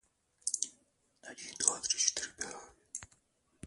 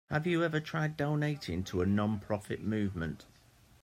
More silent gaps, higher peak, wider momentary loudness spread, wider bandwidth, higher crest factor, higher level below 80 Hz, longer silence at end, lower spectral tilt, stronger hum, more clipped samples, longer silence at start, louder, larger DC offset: neither; first, -10 dBFS vs -16 dBFS; first, 18 LU vs 6 LU; second, 12 kHz vs 15 kHz; first, 30 dB vs 18 dB; second, -72 dBFS vs -62 dBFS; second, 0 s vs 0.6 s; second, 1 dB/octave vs -7 dB/octave; neither; neither; first, 0.45 s vs 0.1 s; about the same, -33 LUFS vs -33 LUFS; neither